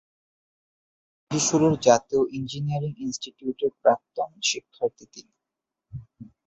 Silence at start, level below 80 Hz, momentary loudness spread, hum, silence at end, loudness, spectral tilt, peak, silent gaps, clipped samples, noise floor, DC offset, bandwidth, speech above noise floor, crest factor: 1.3 s; -60 dBFS; 13 LU; none; 0.2 s; -25 LUFS; -4.5 dB/octave; -4 dBFS; none; under 0.1%; -86 dBFS; under 0.1%; 8.4 kHz; 62 dB; 22 dB